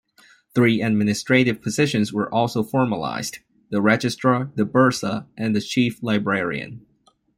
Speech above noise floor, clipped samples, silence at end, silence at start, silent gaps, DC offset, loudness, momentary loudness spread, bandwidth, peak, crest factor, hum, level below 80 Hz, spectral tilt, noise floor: 34 dB; under 0.1%; 0.6 s; 0.55 s; none; under 0.1%; -21 LUFS; 9 LU; 16 kHz; -2 dBFS; 18 dB; none; -60 dBFS; -5.5 dB/octave; -55 dBFS